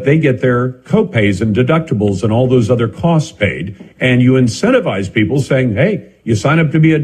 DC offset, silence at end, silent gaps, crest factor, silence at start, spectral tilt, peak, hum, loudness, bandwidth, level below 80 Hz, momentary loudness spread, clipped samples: under 0.1%; 0 s; none; 12 dB; 0 s; -7 dB/octave; 0 dBFS; none; -13 LUFS; 10 kHz; -46 dBFS; 6 LU; under 0.1%